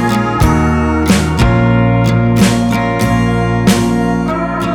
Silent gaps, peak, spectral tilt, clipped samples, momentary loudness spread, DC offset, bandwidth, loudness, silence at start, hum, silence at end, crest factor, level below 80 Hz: none; 0 dBFS; -6 dB/octave; under 0.1%; 3 LU; under 0.1%; 19 kHz; -12 LUFS; 0 s; none; 0 s; 12 dB; -22 dBFS